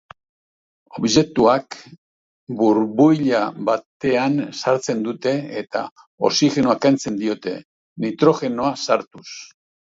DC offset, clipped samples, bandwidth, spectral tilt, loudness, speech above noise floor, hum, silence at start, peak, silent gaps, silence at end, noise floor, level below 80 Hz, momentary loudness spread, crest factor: under 0.1%; under 0.1%; 7.8 kHz; -5 dB/octave; -19 LUFS; over 71 dB; none; 0.95 s; -2 dBFS; 1.98-2.47 s, 3.86-4.00 s, 5.91-5.96 s, 6.07-6.18 s, 7.65-7.96 s, 9.07-9.11 s; 0.45 s; under -90 dBFS; -58 dBFS; 18 LU; 18 dB